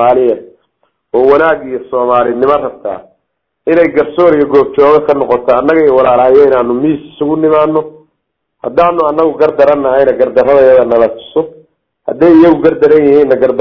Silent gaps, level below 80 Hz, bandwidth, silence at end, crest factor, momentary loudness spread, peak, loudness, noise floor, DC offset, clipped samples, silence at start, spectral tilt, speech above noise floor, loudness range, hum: none; -44 dBFS; 6 kHz; 0 s; 8 dB; 11 LU; 0 dBFS; -9 LUFS; -68 dBFS; under 0.1%; 3%; 0 s; -8.5 dB/octave; 60 dB; 4 LU; none